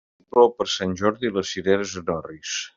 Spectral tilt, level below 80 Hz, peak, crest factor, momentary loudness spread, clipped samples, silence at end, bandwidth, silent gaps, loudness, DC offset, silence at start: -4 dB/octave; -60 dBFS; -4 dBFS; 20 dB; 11 LU; under 0.1%; 0.1 s; 7.6 kHz; none; -23 LUFS; under 0.1%; 0.35 s